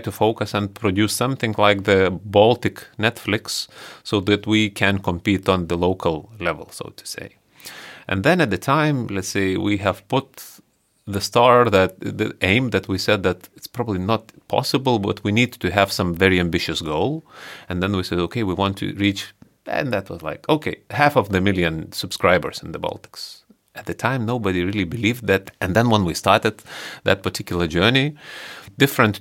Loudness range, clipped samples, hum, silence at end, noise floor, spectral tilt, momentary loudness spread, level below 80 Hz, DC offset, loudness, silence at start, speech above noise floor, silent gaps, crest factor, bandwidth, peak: 4 LU; under 0.1%; none; 0 s; -40 dBFS; -5 dB/octave; 16 LU; -50 dBFS; under 0.1%; -20 LUFS; 0 s; 20 dB; none; 20 dB; 17 kHz; 0 dBFS